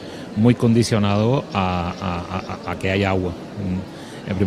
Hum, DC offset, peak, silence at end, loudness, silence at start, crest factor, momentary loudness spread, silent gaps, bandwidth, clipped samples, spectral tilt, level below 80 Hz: none; under 0.1%; -2 dBFS; 0 s; -21 LUFS; 0 s; 18 dB; 12 LU; none; 13 kHz; under 0.1%; -6.5 dB/octave; -46 dBFS